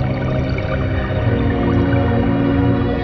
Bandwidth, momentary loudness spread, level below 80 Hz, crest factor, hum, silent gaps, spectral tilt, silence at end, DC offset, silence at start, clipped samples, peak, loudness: 6 kHz; 4 LU; -26 dBFS; 12 dB; none; none; -9.5 dB/octave; 0 s; under 0.1%; 0 s; under 0.1%; -4 dBFS; -17 LUFS